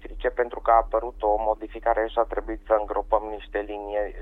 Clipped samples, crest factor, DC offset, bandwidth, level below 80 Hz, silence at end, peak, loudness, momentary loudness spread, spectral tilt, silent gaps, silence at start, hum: under 0.1%; 18 dB; under 0.1%; 4 kHz; -40 dBFS; 0 s; -6 dBFS; -25 LUFS; 10 LU; -7.5 dB/octave; none; 0 s; none